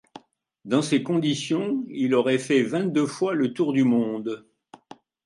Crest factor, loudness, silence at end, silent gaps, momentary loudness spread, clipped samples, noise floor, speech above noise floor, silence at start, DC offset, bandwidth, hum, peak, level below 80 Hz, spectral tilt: 16 dB; -24 LUFS; 0.85 s; none; 7 LU; under 0.1%; -50 dBFS; 27 dB; 0.15 s; under 0.1%; 11.5 kHz; none; -8 dBFS; -72 dBFS; -5.5 dB/octave